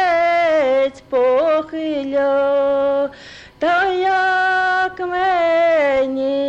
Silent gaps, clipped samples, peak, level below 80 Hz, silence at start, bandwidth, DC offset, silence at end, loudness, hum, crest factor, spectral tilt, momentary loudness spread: none; under 0.1%; -8 dBFS; -54 dBFS; 0 s; 8.2 kHz; under 0.1%; 0 s; -17 LUFS; none; 10 dB; -4.5 dB/octave; 6 LU